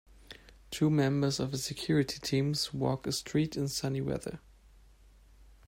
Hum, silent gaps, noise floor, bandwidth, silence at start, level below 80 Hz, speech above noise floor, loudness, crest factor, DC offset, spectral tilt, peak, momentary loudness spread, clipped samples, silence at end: none; none; -59 dBFS; 16 kHz; 0.3 s; -58 dBFS; 28 dB; -32 LUFS; 16 dB; under 0.1%; -5.5 dB/octave; -16 dBFS; 20 LU; under 0.1%; 0.25 s